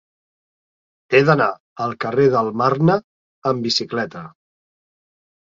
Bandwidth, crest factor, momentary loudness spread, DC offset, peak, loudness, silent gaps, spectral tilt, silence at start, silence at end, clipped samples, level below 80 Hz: 7.6 kHz; 20 dB; 11 LU; under 0.1%; -2 dBFS; -19 LUFS; 1.60-1.76 s, 3.04-3.42 s; -6 dB/octave; 1.1 s; 1.3 s; under 0.1%; -60 dBFS